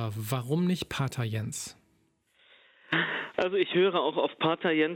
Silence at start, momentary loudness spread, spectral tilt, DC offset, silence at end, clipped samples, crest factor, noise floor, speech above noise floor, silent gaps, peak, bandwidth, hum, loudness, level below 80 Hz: 0 s; 8 LU; -5 dB/octave; under 0.1%; 0 s; under 0.1%; 18 dB; -70 dBFS; 41 dB; none; -12 dBFS; 16.5 kHz; none; -29 LUFS; -64 dBFS